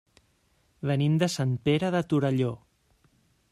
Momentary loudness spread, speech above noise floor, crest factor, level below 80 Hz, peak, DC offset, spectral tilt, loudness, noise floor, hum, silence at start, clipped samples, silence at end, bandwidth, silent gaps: 7 LU; 42 dB; 18 dB; -62 dBFS; -10 dBFS; under 0.1%; -6.5 dB/octave; -27 LUFS; -68 dBFS; none; 0.85 s; under 0.1%; 0.95 s; 13 kHz; none